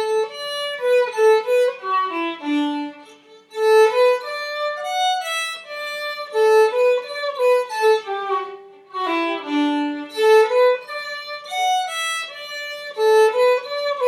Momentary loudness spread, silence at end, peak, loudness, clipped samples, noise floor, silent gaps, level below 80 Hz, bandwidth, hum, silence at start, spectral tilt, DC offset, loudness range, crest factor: 13 LU; 0 s; -4 dBFS; -20 LUFS; under 0.1%; -47 dBFS; none; -90 dBFS; 14 kHz; none; 0 s; -1 dB/octave; under 0.1%; 1 LU; 16 dB